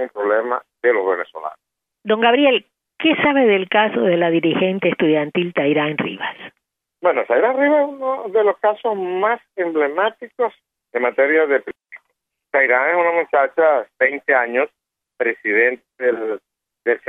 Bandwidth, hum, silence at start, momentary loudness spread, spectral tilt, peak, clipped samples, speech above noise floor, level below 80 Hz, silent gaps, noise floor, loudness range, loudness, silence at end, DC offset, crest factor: 3.9 kHz; none; 0 s; 9 LU; -8 dB/octave; -2 dBFS; under 0.1%; 56 dB; -68 dBFS; none; -74 dBFS; 3 LU; -18 LUFS; 0.1 s; under 0.1%; 16 dB